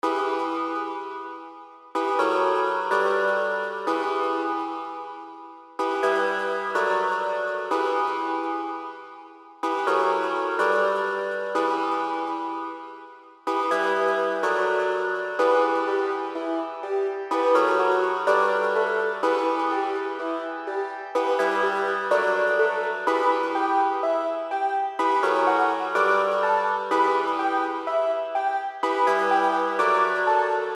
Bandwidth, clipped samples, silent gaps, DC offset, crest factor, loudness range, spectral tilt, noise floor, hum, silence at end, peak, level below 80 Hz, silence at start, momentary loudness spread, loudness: 12.5 kHz; under 0.1%; none; under 0.1%; 18 dB; 4 LU; -3.5 dB/octave; -46 dBFS; none; 0 s; -6 dBFS; under -90 dBFS; 0.05 s; 9 LU; -24 LUFS